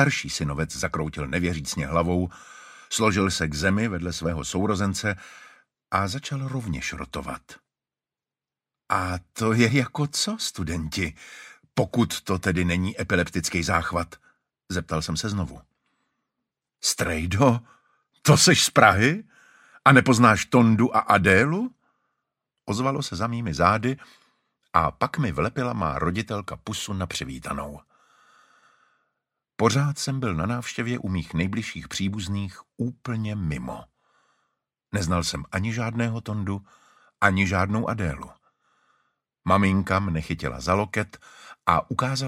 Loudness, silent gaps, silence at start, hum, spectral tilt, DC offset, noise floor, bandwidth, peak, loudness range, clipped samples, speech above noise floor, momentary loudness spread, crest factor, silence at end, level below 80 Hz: -24 LUFS; none; 0 s; none; -4.5 dB/octave; under 0.1%; under -90 dBFS; 16 kHz; 0 dBFS; 11 LU; under 0.1%; over 66 dB; 14 LU; 24 dB; 0 s; -46 dBFS